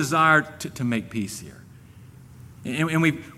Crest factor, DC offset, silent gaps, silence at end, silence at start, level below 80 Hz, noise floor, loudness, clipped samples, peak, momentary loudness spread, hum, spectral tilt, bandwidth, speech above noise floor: 20 dB; under 0.1%; none; 0 s; 0 s; -58 dBFS; -47 dBFS; -23 LUFS; under 0.1%; -4 dBFS; 19 LU; none; -5 dB/octave; 15.5 kHz; 23 dB